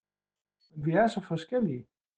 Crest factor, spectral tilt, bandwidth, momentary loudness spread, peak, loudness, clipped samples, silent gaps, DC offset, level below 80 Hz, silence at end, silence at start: 18 dB; -7.5 dB/octave; 9 kHz; 13 LU; -14 dBFS; -30 LUFS; under 0.1%; none; under 0.1%; -66 dBFS; 0.35 s; 0.75 s